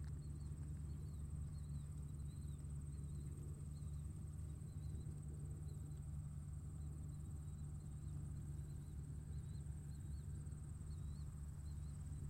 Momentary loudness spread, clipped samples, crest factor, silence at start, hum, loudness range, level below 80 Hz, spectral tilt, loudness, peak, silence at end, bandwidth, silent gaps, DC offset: 2 LU; under 0.1%; 10 dB; 0 s; none; 1 LU; -54 dBFS; -7.5 dB/octave; -51 LUFS; -38 dBFS; 0 s; 16 kHz; none; under 0.1%